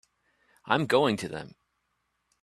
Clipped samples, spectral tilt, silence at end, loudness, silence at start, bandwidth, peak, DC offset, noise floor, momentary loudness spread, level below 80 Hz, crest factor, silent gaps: under 0.1%; -5.5 dB/octave; 0.95 s; -27 LUFS; 0.65 s; 14 kHz; -6 dBFS; under 0.1%; -77 dBFS; 17 LU; -68 dBFS; 24 dB; none